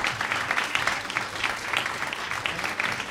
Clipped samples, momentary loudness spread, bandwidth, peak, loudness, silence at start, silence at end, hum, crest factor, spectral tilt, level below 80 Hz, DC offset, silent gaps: under 0.1%; 4 LU; 16 kHz; -8 dBFS; -27 LUFS; 0 s; 0 s; none; 20 dB; -1.5 dB/octave; -58 dBFS; under 0.1%; none